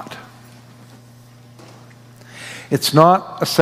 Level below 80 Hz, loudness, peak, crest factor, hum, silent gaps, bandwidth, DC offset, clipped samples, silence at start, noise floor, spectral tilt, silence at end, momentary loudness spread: -64 dBFS; -15 LUFS; 0 dBFS; 20 dB; 60 Hz at -45 dBFS; none; 16 kHz; under 0.1%; 0.1%; 0 s; -44 dBFS; -5 dB/octave; 0 s; 24 LU